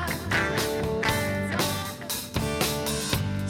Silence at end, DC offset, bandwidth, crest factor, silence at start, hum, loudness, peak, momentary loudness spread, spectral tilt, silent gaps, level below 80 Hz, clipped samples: 0 s; under 0.1%; 18.5 kHz; 16 dB; 0 s; none; -27 LUFS; -12 dBFS; 5 LU; -4 dB/octave; none; -42 dBFS; under 0.1%